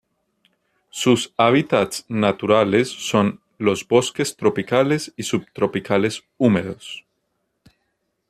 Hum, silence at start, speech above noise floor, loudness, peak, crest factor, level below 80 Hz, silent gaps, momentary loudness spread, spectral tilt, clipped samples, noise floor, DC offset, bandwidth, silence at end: none; 0.95 s; 53 dB; -20 LUFS; -2 dBFS; 18 dB; -60 dBFS; none; 8 LU; -5 dB/octave; under 0.1%; -73 dBFS; under 0.1%; 14 kHz; 1.3 s